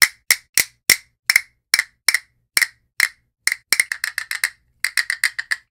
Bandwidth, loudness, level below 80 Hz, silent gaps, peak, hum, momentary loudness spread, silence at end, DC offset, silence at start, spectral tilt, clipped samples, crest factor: over 20 kHz; -19 LUFS; -58 dBFS; 0.49-0.53 s, 1.19-1.23 s; 0 dBFS; none; 7 LU; 0.15 s; under 0.1%; 0 s; 2.5 dB/octave; under 0.1%; 22 dB